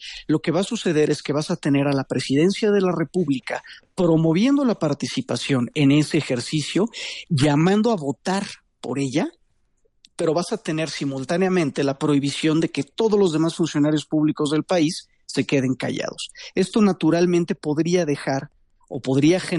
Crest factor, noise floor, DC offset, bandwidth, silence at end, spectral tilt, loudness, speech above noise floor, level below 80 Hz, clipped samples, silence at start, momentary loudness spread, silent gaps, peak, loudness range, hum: 14 dB; -64 dBFS; under 0.1%; 11.5 kHz; 0 s; -6 dB/octave; -21 LUFS; 43 dB; -58 dBFS; under 0.1%; 0 s; 9 LU; none; -6 dBFS; 3 LU; none